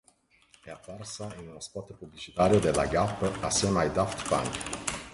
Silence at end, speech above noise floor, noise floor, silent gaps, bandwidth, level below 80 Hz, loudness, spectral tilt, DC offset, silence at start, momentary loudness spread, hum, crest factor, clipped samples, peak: 0 s; 35 dB; -64 dBFS; none; 11.5 kHz; -48 dBFS; -28 LUFS; -4.5 dB/octave; under 0.1%; 0.65 s; 19 LU; none; 20 dB; under 0.1%; -10 dBFS